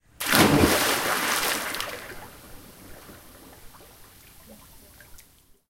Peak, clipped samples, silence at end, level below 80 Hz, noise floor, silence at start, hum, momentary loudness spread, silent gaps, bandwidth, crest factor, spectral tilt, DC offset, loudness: 0 dBFS; under 0.1%; 0.55 s; -46 dBFS; -56 dBFS; 0.2 s; none; 28 LU; none; 17 kHz; 28 dB; -3 dB/octave; under 0.1%; -22 LUFS